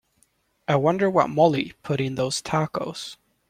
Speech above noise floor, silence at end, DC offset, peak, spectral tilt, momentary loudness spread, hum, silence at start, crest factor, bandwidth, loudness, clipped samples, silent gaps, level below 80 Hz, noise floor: 43 dB; 0.35 s; under 0.1%; -4 dBFS; -5.5 dB/octave; 13 LU; none; 0.7 s; 20 dB; 15.5 kHz; -23 LUFS; under 0.1%; none; -60 dBFS; -66 dBFS